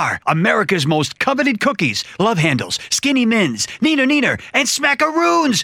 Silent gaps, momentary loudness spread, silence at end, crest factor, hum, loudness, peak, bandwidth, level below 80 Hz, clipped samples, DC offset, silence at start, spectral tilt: none; 4 LU; 0 s; 16 dB; none; -16 LUFS; 0 dBFS; 17 kHz; -56 dBFS; under 0.1%; under 0.1%; 0 s; -4 dB/octave